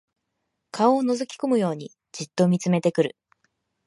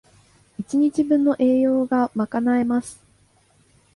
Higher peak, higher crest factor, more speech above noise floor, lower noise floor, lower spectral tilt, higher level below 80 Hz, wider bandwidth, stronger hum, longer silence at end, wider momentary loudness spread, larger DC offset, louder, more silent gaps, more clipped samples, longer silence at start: about the same, -6 dBFS vs -8 dBFS; first, 20 dB vs 14 dB; first, 56 dB vs 39 dB; first, -79 dBFS vs -59 dBFS; about the same, -6.5 dB/octave vs -6.5 dB/octave; second, -74 dBFS vs -62 dBFS; about the same, 11.5 kHz vs 11.5 kHz; second, none vs 50 Hz at -55 dBFS; second, 0.8 s vs 1 s; first, 15 LU vs 12 LU; neither; second, -23 LUFS vs -20 LUFS; neither; neither; first, 0.75 s vs 0.6 s